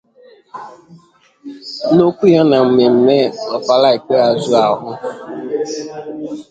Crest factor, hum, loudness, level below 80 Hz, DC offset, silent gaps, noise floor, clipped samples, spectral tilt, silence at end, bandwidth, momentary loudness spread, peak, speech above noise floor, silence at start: 14 dB; none; -13 LUFS; -58 dBFS; under 0.1%; none; -46 dBFS; under 0.1%; -6.5 dB/octave; 0.1 s; 9 kHz; 20 LU; 0 dBFS; 33 dB; 0.55 s